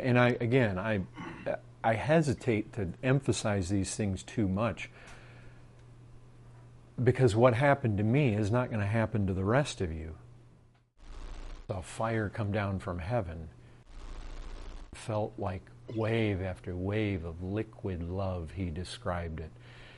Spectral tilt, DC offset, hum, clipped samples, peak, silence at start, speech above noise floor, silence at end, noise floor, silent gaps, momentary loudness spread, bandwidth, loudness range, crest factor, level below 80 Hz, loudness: -6.5 dB/octave; under 0.1%; none; under 0.1%; -10 dBFS; 0 s; 31 dB; 0 s; -61 dBFS; none; 21 LU; 11.5 kHz; 9 LU; 22 dB; -52 dBFS; -31 LUFS